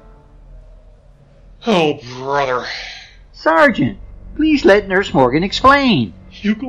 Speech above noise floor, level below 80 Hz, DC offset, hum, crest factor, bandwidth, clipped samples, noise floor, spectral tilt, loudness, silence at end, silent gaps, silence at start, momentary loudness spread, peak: 31 dB; -38 dBFS; under 0.1%; none; 16 dB; 10.5 kHz; under 0.1%; -45 dBFS; -5.5 dB/octave; -15 LUFS; 0 s; none; 0.5 s; 15 LU; 0 dBFS